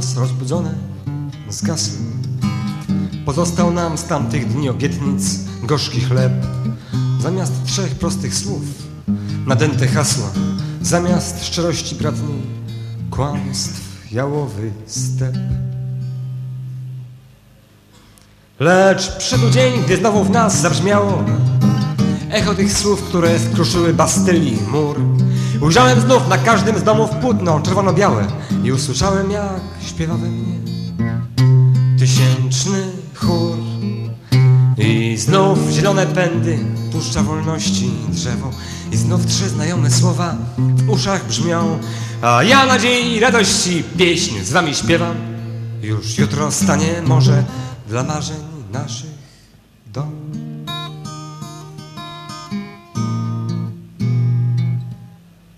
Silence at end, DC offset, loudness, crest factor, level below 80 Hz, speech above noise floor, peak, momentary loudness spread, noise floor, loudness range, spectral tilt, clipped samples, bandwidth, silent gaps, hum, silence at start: 0.5 s; under 0.1%; -16 LUFS; 16 dB; -40 dBFS; 32 dB; 0 dBFS; 14 LU; -47 dBFS; 10 LU; -5 dB/octave; under 0.1%; 13.5 kHz; none; none; 0 s